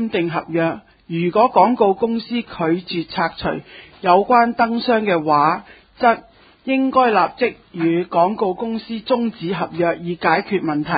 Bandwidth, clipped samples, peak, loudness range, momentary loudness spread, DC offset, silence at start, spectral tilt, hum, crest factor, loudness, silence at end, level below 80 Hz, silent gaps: 5 kHz; under 0.1%; 0 dBFS; 2 LU; 10 LU; under 0.1%; 0 s; -11 dB/octave; none; 18 dB; -18 LUFS; 0 s; -54 dBFS; none